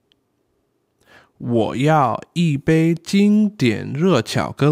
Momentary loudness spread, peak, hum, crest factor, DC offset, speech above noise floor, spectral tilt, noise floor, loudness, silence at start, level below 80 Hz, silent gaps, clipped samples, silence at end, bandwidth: 5 LU; -4 dBFS; none; 14 dB; under 0.1%; 50 dB; -7 dB/octave; -67 dBFS; -18 LUFS; 1.4 s; -54 dBFS; none; under 0.1%; 0 s; 15 kHz